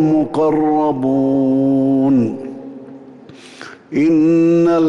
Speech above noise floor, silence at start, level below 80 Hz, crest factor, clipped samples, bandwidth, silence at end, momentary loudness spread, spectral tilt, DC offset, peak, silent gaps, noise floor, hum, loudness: 25 dB; 0 s; -54 dBFS; 8 dB; under 0.1%; 7.6 kHz; 0 s; 21 LU; -8.5 dB/octave; under 0.1%; -6 dBFS; none; -39 dBFS; none; -15 LUFS